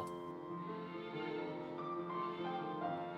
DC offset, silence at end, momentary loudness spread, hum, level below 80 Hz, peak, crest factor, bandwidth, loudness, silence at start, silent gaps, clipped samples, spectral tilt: under 0.1%; 0 s; 5 LU; none; -80 dBFS; -28 dBFS; 14 dB; 12 kHz; -43 LUFS; 0 s; none; under 0.1%; -7 dB/octave